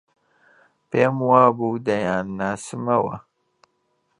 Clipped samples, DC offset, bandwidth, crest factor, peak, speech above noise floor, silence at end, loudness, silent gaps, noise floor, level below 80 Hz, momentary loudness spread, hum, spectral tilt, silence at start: under 0.1%; under 0.1%; 11 kHz; 20 dB; -2 dBFS; 49 dB; 1 s; -21 LUFS; none; -69 dBFS; -60 dBFS; 12 LU; none; -6.5 dB/octave; 0.9 s